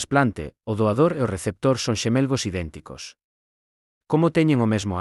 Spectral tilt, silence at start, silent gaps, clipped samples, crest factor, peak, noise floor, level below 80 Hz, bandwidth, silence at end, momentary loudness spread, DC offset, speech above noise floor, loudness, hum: -6 dB/octave; 0 s; 3.24-4.01 s; under 0.1%; 18 dB; -6 dBFS; under -90 dBFS; -52 dBFS; 12 kHz; 0 s; 16 LU; under 0.1%; over 68 dB; -22 LUFS; none